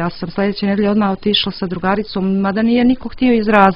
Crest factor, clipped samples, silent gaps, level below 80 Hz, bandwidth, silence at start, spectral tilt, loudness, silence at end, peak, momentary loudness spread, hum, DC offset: 14 dB; under 0.1%; none; -40 dBFS; 5.6 kHz; 0 s; -8.5 dB/octave; -16 LUFS; 0 s; 0 dBFS; 6 LU; none; under 0.1%